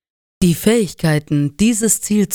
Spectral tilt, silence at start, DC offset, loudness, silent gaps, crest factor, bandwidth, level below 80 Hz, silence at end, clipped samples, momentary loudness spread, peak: -5 dB/octave; 0.4 s; under 0.1%; -16 LUFS; none; 16 dB; over 20 kHz; -40 dBFS; 0 s; under 0.1%; 4 LU; 0 dBFS